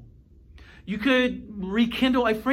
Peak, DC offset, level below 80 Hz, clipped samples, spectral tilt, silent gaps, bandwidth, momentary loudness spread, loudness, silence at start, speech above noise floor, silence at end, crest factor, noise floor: -10 dBFS; under 0.1%; -48 dBFS; under 0.1%; -5.5 dB/octave; none; 15.5 kHz; 13 LU; -24 LUFS; 0 s; 28 dB; 0 s; 16 dB; -51 dBFS